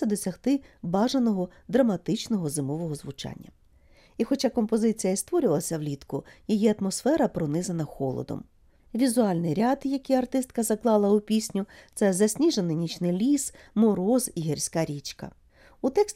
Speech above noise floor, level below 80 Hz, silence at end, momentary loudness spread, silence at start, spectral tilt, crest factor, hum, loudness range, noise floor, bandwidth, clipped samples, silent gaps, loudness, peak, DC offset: 31 dB; -58 dBFS; 0.05 s; 12 LU; 0 s; -5.5 dB/octave; 18 dB; none; 3 LU; -57 dBFS; 16 kHz; under 0.1%; none; -26 LUFS; -10 dBFS; under 0.1%